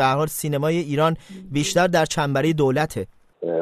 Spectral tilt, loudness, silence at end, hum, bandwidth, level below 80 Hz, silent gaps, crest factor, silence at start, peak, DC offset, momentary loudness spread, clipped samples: -5 dB/octave; -21 LUFS; 0 s; none; 14 kHz; -50 dBFS; none; 16 dB; 0 s; -6 dBFS; under 0.1%; 12 LU; under 0.1%